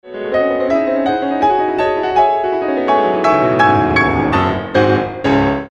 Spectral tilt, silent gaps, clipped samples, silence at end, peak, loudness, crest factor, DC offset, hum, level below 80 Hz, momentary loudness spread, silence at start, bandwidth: -7 dB/octave; none; under 0.1%; 0.05 s; 0 dBFS; -14 LUFS; 14 dB; under 0.1%; none; -38 dBFS; 5 LU; 0.05 s; 8.8 kHz